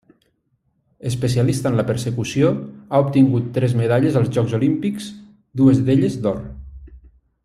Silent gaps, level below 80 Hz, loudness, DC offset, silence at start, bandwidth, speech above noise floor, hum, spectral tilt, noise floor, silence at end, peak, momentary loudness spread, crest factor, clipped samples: none; -46 dBFS; -19 LUFS; under 0.1%; 1.05 s; 13.5 kHz; 49 dB; none; -7.5 dB/octave; -67 dBFS; 0.45 s; -2 dBFS; 14 LU; 16 dB; under 0.1%